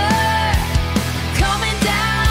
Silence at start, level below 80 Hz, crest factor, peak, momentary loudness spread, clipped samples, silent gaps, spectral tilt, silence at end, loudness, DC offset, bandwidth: 0 s; -24 dBFS; 14 dB; -4 dBFS; 4 LU; under 0.1%; none; -4 dB/octave; 0 s; -18 LUFS; under 0.1%; 16 kHz